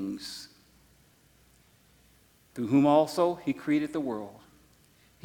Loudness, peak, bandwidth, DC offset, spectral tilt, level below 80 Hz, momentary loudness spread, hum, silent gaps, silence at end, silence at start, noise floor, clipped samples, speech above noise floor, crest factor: -28 LUFS; -10 dBFS; 17.5 kHz; under 0.1%; -6.5 dB/octave; -68 dBFS; 22 LU; none; none; 0.9 s; 0 s; -62 dBFS; under 0.1%; 36 dB; 20 dB